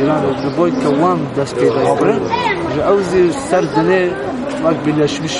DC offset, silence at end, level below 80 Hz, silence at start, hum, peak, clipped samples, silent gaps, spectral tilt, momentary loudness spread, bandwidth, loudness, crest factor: under 0.1%; 0 s; -44 dBFS; 0 s; none; 0 dBFS; under 0.1%; none; -6 dB/octave; 4 LU; 11.5 kHz; -15 LUFS; 14 dB